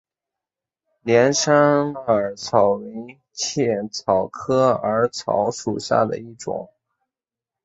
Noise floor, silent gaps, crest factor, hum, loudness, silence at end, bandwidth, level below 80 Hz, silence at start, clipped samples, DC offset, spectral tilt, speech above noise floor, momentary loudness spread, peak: -89 dBFS; none; 20 dB; none; -20 LUFS; 1 s; 8 kHz; -58 dBFS; 1.05 s; under 0.1%; under 0.1%; -4.5 dB/octave; 69 dB; 14 LU; -2 dBFS